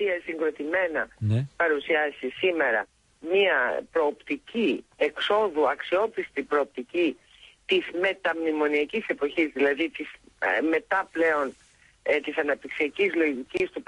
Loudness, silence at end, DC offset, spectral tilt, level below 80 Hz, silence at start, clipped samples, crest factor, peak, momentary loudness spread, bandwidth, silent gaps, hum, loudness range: -26 LUFS; 0.05 s; under 0.1%; -6.5 dB/octave; -62 dBFS; 0 s; under 0.1%; 18 dB; -10 dBFS; 6 LU; 11 kHz; none; none; 2 LU